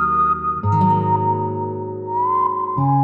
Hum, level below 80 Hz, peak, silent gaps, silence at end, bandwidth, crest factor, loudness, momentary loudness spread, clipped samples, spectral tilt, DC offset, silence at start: none; -48 dBFS; -6 dBFS; none; 0 s; 4.5 kHz; 14 dB; -19 LUFS; 8 LU; under 0.1%; -10.5 dB/octave; under 0.1%; 0 s